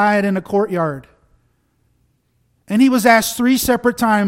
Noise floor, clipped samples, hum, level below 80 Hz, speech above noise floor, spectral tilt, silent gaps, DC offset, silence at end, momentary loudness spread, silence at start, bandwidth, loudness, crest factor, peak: -63 dBFS; under 0.1%; none; -48 dBFS; 48 dB; -4.5 dB/octave; none; under 0.1%; 0 s; 9 LU; 0 s; 16.5 kHz; -15 LUFS; 16 dB; 0 dBFS